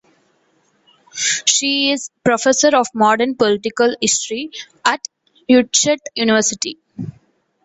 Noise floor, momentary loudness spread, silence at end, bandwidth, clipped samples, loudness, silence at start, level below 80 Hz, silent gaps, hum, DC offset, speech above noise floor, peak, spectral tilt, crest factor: -60 dBFS; 17 LU; 0.55 s; 8.4 kHz; under 0.1%; -16 LUFS; 1.15 s; -60 dBFS; none; none; under 0.1%; 44 dB; 0 dBFS; -2 dB/octave; 18 dB